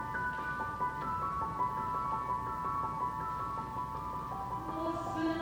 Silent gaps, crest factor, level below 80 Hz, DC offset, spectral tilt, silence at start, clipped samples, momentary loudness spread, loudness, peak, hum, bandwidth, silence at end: none; 14 dB; -54 dBFS; under 0.1%; -6.5 dB/octave; 0 s; under 0.1%; 4 LU; -36 LUFS; -22 dBFS; none; over 20 kHz; 0 s